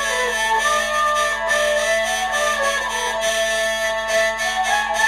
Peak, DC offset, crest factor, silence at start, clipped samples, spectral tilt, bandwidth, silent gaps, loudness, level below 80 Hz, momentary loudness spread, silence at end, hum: -6 dBFS; under 0.1%; 14 dB; 0 s; under 0.1%; 0 dB/octave; 14 kHz; none; -19 LUFS; -46 dBFS; 2 LU; 0 s; none